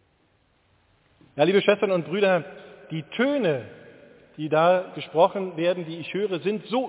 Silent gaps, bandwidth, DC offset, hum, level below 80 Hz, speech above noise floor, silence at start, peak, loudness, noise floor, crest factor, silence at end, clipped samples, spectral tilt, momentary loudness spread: none; 4 kHz; under 0.1%; none; -72 dBFS; 42 dB; 1.35 s; -6 dBFS; -24 LUFS; -65 dBFS; 18 dB; 0 s; under 0.1%; -10 dB/octave; 15 LU